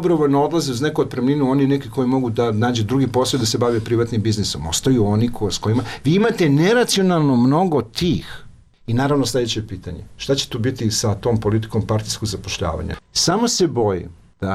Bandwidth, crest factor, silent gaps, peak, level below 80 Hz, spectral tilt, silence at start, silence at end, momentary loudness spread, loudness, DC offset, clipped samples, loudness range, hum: 15.5 kHz; 12 dB; none; -8 dBFS; -42 dBFS; -5 dB/octave; 0 s; 0 s; 8 LU; -19 LUFS; under 0.1%; under 0.1%; 4 LU; none